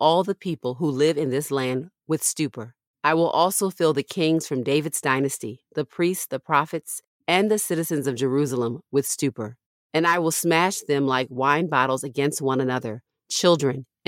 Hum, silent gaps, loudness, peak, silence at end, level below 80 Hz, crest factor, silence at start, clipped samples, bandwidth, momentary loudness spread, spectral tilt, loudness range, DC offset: none; 2.87-2.94 s, 7.07-7.20 s, 9.66-9.90 s; -23 LUFS; -4 dBFS; 0.25 s; -72 dBFS; 18 dB; 0 s; under 0.1%; 17 kHz; 10 LU; -4 dB/octave; 2 LU; under 0.1%